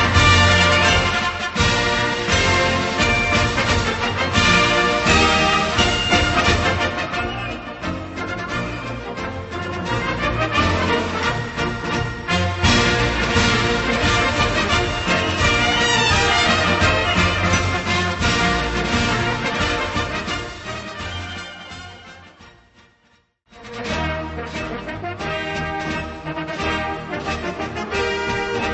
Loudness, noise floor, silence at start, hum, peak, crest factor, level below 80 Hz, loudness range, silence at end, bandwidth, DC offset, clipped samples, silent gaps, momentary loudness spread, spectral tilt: -18 LUFS; -60 dBFS; 0 s; none; 0 dBFS; 20 dB; -32 dBFS; 12 LU; 0 s; 8.4 kHz; under 0.1%; under 0.1%; none; 13 LU; -4 dB/octave